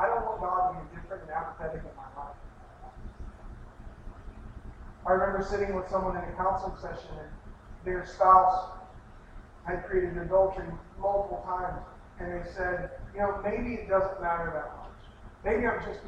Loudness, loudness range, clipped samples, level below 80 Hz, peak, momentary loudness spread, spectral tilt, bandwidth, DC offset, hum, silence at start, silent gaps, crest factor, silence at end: -30 LUFS; 14 LU; under 0.1%; -46 dBFS; -8 dBFS; 22 LU; -7.5 dB/octave; 8.6 kHz; under 0.1%; none; 0 s; none; 24 dB; 0 s